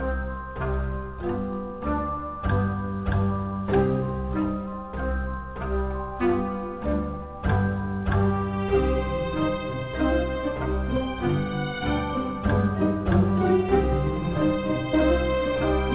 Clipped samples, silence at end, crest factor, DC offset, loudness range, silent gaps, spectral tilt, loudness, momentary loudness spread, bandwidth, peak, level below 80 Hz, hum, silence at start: under 0.1%; 0 s; 16 dB; under 0.1%; 5 LU; none; -11.5 dB/octave; -26 LUFS; 8 LU; 4 kHz; -10 dBFS; -32 dBFS; none; 0 s